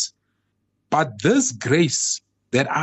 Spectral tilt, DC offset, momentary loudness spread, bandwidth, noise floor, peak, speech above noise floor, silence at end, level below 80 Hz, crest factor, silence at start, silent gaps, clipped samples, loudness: -4 dB/octave; under 0.1%; 6 LU; 8.6 kHz; -72 dBFS; -6 dBFS; 52 dB; 0 s; -62 dBFS; 16 dB; 0 s; none; under 0.1%; -21 LUFS